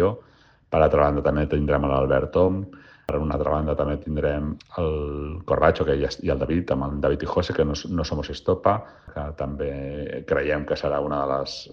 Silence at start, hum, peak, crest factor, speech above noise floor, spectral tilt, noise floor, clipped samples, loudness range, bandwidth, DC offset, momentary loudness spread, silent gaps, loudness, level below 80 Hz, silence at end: 0 s; none; -4 dBFS; 20 dB; 32 dB; -7 dB/octave; -55 dBFS; under 0.1%; 4 LU; 7.2 kHz; under 0.1%; 11 LU; none; -24 LUFS; -36 dBFS; 0 s